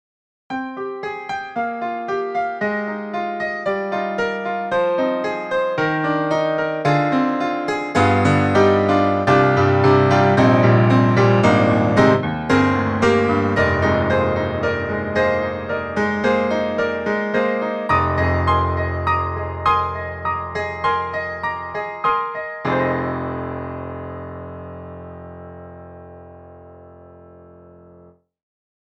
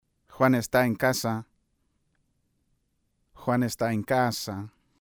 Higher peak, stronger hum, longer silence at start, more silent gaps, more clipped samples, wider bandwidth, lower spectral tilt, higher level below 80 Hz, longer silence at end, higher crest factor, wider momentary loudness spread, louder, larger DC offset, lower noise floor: first, -2 dBFS vs -8 dBFS; neither; first, 0.5 s vs 0.3 s; neither; neither; second, 9.4 kHz vs over 20 kHz; first, -7.5 dB/octave vs -5.5 dB/octave; first, -44 dBFS vs -60 dBFS; first, 1.9 s vs 0.35 s; about the same, 18 dB vs 20 dB; about the same, 14 LU vs 12 LU; first, -19 LUFS vs -26 LUFS; neither; second, -49 dBFS vs -73 dBFS